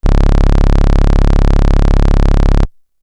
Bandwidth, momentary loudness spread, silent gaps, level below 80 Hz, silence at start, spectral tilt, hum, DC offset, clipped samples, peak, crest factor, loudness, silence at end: 7 kHz; 1 LU; none; -8 dBFS; 0.05 s; -7.5 dB/octave; none; under 0.1%; under 0.1%; -2 dBFS; 6 dB; -13 LUFS; 0.35 s